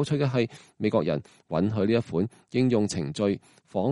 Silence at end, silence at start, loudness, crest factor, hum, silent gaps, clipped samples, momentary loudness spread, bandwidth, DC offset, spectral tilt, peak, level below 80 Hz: 0 s; 0 s; -27 LUFS; 16 dB; none; none; under 0.1%; 8 LU; 11.5 kHz; under 0.1%; -7 dB/octave; -10 dBFS; -60 dBFS